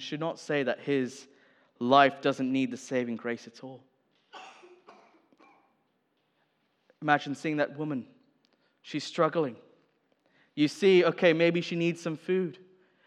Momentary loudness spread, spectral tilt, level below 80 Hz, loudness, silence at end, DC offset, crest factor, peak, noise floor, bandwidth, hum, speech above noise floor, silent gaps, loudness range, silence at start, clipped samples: 17 LU; -5.5 dB/octave; under -90 dBFS; -28 LUFS; 0.5 s; under 0.1%; 24 dB; -6 dBFS; -75 dBFS; 11 kHz; none; 47 dB; none; 9 LU; 0 s; under 0.1%